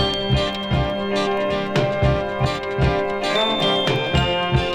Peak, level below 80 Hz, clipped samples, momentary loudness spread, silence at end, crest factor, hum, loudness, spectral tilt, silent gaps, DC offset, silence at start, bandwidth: -4 dBFS; -32 dBFS; under 0.1%; 4 LU; 0 s; 16 dB; none; -20 LUFS; -6 dB/octave; none; under 0.1%; 0 s; 11.5 kHz